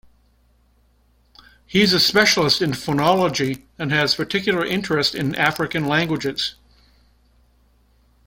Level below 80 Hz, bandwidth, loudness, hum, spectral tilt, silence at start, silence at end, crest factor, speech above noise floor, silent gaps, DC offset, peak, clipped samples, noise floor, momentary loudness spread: -52 dBFS; 16.5 kHz; -19 LUFS; none; -4 dB/octave; 1.7 s; 1.75 s; 20 dB; 39 dB; none; under 0.1%; -2 dBFS; under 0.1%; -59 dBFS; 9 LU